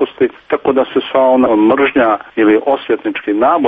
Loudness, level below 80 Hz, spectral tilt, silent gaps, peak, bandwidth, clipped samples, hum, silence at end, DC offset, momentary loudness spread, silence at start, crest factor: -13 LUFS; -52 dBFS; -8 dB/octave; none; 0 dBFS; 3.9 kHz; under 0.1%; none; 0 s; under 0.1%; 7 LU; 0 s; 12 dB